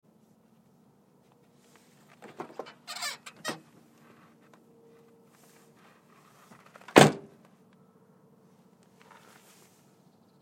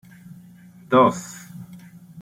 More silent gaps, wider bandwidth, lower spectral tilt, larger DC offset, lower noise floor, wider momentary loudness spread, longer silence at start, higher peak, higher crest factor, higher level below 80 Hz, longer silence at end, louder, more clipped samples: neither; about the same, 16.5 kHz vs 16 kHz; second, -4.5 dB/octave vs -6 dB/octave; neither; first, -63 dBFS vs -47 dBFS; first, 30 LU vs 24 LU; first, 2.4 s vs 0.9 s; first, 0 dBFS vs -4 dBFS; first, 34 dB vs 20 dB; second, -76 dBFS vs -64 dBFS; first, 3.25 s vs 0 s; second, -26 LUFS vs -18 LUFS; neither